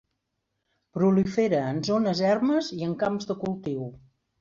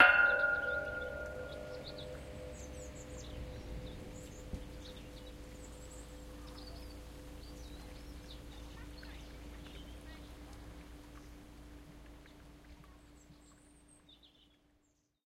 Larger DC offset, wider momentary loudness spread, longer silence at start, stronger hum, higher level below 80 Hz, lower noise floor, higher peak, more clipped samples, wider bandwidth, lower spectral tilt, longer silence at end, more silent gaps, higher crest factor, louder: neither; second, 10 LU vs 20 LU; first, 0.95 s vs 0 s; neither; second, -62 dBFS vs -54 dBFS; first, -80 dBFS vs -76 dBFS; about the same, -10 dBFS vs -10 dBFS; neither; second, 7.6 kHz vs 16 kHz; first, -6.5 dB/octave vs -4 dB/octave; second, 0.45 s vs 0.8 s; neither; second, 16 dB vs 30 dB; first, -26 LUFS vs -40 LUFS